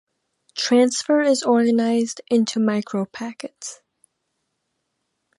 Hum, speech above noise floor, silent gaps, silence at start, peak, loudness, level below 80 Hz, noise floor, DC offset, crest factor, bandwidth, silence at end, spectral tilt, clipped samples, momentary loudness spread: none; 56 dB; none; 0.55 s; -6 dBFS; -20 LUFS; -74 dBFS; -75 dBFS; under 0.1%; 16 dB; 11.5 kHz; 1.65 s; -4 dB/octave; under 0.1%; 16 LU